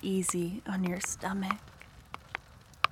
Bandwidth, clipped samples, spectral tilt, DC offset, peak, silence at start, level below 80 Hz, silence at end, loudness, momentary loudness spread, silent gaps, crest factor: 16.5 kHz; under 0.1%; -4 dB/octave; under 0.1%; -6 dBFS; 0 s; -60 dBFS; 0.05 s; -34 LUFS; 17 LU; none; 28 dB